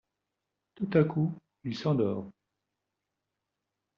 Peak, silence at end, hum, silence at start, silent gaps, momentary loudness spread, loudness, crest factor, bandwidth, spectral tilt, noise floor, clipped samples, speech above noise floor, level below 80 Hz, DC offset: -12 dBFS; 1.65 s; none; 0.8 s; none; 13 LU; -30 LUFS; 22 dB; 6.8 kHz; -7.5 dB/octave; -86 dBFS; under 0.1%; 57 dB; -70 dBFS; under 0.1%